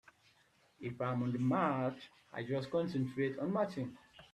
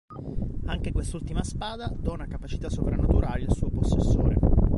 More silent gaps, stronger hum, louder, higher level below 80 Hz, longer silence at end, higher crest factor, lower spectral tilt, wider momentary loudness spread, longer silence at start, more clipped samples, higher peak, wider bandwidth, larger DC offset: neither; neither; second, -37 LUFS vs -28 LUFS; second, -74 dBFS vs -28 dBFS; about the same, 0.1 s vs 0 s; about the same, 20 dB vs 16 dB; about the same, -8 dB/octave vs -7.5 dB/octave; first, 14 LU vs 11 LU; first, 0.8 s vs 0.1 s; neither; second, -18 dBFS vs -8 dBFS; about the same, 11 kHz vs 11.5 kHz; neither